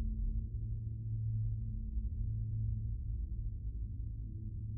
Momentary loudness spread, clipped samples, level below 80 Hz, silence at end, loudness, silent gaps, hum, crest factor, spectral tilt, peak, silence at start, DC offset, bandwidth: 5 LU; under 0.1%; -40 dBFS; 0 s; -41 LUFS; none; none; 10 dB; -23 dB/octave; -26 dBFS; 0 s; under 0.1%; 0.6 kHz